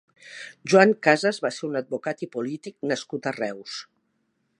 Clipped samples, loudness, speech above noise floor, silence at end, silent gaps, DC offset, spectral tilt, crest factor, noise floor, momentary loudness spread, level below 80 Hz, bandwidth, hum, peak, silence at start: under 0.1%; -24 LUFS; 48 dB; 0.75 s; none; under 0.1%; -5 dB/octave; 24 dB; -72 dBFS; 19 LU; -80 dBFS; 11 kHz; none; -2 dBFS; 0.25 s